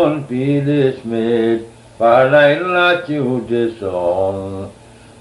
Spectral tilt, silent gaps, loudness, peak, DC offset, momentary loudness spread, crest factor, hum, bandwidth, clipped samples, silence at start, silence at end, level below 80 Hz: -7 dB/octave; none; -15 LUFS; -2 dBFS; under 0.1%; 10 LU; 14 dB; none; 11.5 kHz; under 0.1%; 0 s; 0.5 s; -52 dBFS